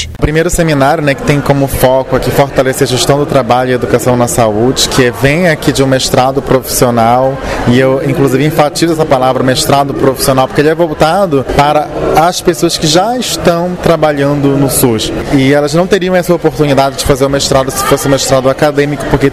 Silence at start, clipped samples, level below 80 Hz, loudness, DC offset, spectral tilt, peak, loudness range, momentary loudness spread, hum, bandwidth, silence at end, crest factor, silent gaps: 0 s; 0.2%; -28 dBFS; -9 LUFS; 0.2%; -5 dB/octave; 0 dBFS; 1 LU; 3 LU; none; 16 kHz; 0 s; 10 dB; none